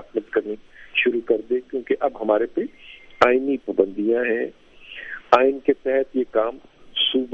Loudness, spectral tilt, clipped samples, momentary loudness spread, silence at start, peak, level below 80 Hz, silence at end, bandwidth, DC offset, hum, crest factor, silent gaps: -22 LUFS; -5 dB/octave; under 0.1%; 15 LU; 0 s; 0 dBFS; -56 dBFS; 0 s; 7.6 kHz; under 0.1%; none; 22 dB; none